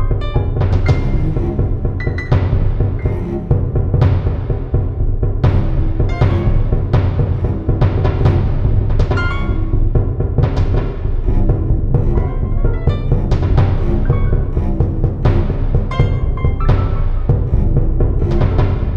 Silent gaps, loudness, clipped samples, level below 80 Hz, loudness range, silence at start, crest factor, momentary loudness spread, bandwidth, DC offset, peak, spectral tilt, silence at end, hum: none; -17 LUFS; under 0.1%; -16 dBFS; 1 LU; 0 s; 12 dB; 4 LU; 5.6 kHz; under 0.1%; -2 dBFS; -9.5 dB/octave; 0 s; none